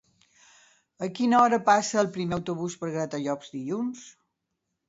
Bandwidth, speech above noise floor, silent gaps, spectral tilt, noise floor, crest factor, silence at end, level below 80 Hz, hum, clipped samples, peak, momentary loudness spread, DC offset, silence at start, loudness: 8 kHz; 56 dB; none; -5 dB/octave; -81 dBFS; 20 dB; 0.8 s; -64 dBFS; none; under 0.1%; -8 dBFS; 14 LU; under 0.1%; 1 s; -26 LUFS